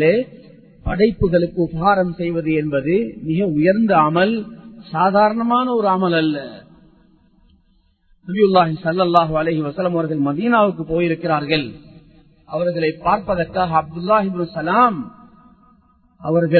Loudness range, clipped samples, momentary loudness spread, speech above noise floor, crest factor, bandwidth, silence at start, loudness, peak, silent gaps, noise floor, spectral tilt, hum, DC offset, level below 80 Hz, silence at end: 3 LU; under 0.1%; 12 LU; 41 dB; 18 dB; 4.6 kHz; 0 s; -18 LUFS; 0 dBFS; none; -58 dBFS; -9.5 dB/octave; none; under 0.1%; -44 dBFS; 0 s